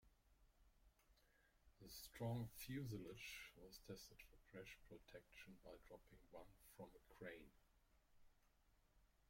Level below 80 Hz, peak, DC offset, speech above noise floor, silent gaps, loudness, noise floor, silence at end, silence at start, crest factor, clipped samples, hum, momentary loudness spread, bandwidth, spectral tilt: -74 dBFS; -36 dBFS; under 0.1%; 22 dB; none; -57 LUFS; -79 dBFS; 0.05 s; 0.05 s; 22 dB; under 0.1%; none; 14 LU; 16.5 kHz; -5 dB/octave